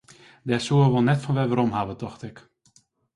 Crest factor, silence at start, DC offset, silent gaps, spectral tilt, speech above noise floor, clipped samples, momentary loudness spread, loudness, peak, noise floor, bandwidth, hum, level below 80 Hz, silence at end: 16 dB; 0.45 s; under 0.1%; none; -7 dB/octave; 39 dB; under 0.1%; 18 LU; -23 LUFS; -8 dBFS; -62 dBFS; 11 kHz; none; -56 dBFS; 0.75 s